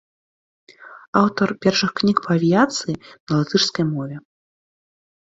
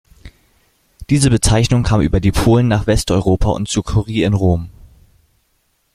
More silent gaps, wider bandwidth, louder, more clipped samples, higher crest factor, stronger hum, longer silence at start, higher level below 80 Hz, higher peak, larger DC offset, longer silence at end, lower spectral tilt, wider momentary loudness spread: first, 1.08-1.13 s, 3.20-3.27 s vs none; second, 7.8 kHz vs 14.5 kHz; second, -19 LUFS vs -15 LUFS; neither; first, 22 dB vs 16 dB; neither; first, 0.8 s vs 0.25 s; second, -58 dBFS vs -28 dBFS; about the same, 0 dBFS vs 0 dBFS; neither; second, 1.05 s vs 1.25 s; about the same, -5 dB/octave vs -6 dB/octave; first, 11 LU vs 6 LU